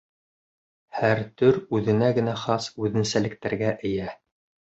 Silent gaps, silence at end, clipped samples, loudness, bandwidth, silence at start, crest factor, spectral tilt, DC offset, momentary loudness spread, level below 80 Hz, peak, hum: none; 0.55 s; under 0.1%; -24 LUFS; 8.2 kHz; 0.95 s; 20 dB; -6 dB/octave; under 0.1%; 7 LU; -56 dBFS; -6 dBFS; none